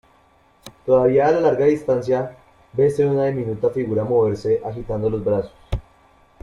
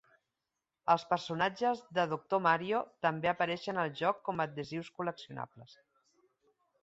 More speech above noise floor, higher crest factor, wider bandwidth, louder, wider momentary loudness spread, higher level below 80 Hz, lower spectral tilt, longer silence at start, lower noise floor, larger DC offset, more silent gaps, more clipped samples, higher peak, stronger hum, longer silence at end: second, 37 dB vs 55 dB; second, 16 dB vs 22 dB; first, 11.5 kHz vs 8 kHz; first, -20 LUFS vs -33 LUFS; first, 14 LU vs 11 LU; first, -42 dBFS vs -74 dBFS; first, -8.5 dB/octave vs -5.5 dB/octave; second, 0.65 s vs 0.85 s; second, -56 dBFS vs -89 dBFS; neither; neither; neither; first, -4 dBFS vs -14 dBFS; neither; second, 0.6 s vs 1.1 s